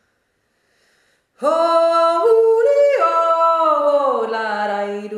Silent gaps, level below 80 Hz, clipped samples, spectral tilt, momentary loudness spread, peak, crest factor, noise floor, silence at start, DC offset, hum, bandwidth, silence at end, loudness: none; -74 dBFS; under 0.1%; -4 dB/octave; 7 LU; -4 dBFS; 12 dB; -67 dBFS; 1.4 s; under 0.1%; none; 11.5 kHz; 0 s; -16 LUFS